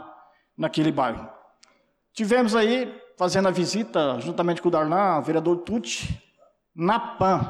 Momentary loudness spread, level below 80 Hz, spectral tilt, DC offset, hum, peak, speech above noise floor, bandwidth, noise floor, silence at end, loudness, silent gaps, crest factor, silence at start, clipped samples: 10 LU; -52 dBFS; -5.5 dB/octave; under 0.1%; none; -12 dBFS; 41 dB; 12.5 kHz; -65 dBFS; 0 s; -24 LUFS; none; 12 dB; 0 s; under 0.1%